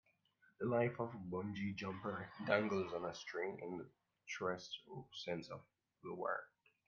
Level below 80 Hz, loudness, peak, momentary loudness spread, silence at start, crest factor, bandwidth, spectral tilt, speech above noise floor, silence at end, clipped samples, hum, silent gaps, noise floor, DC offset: -80 dBFS; -43 LUFS; -20 dBFS; 14 LU; 0.6 s; 24 dB; 7.2 kHz; -4.5 dB/octave; 33 dB; 0.4 s; under 0.1%; none; none; -75 dBFS; under 0.1%